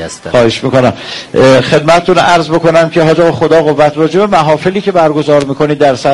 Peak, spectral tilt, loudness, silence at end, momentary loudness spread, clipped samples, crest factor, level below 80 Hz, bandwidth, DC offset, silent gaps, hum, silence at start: 0 dBFS; -5.5 dB/octave; -8 LUFS; 0 s; 4 LU; 0.5%; 8 dB; -40 dBFS; 11.5 kHz; under 0.1%; none; none; 0 s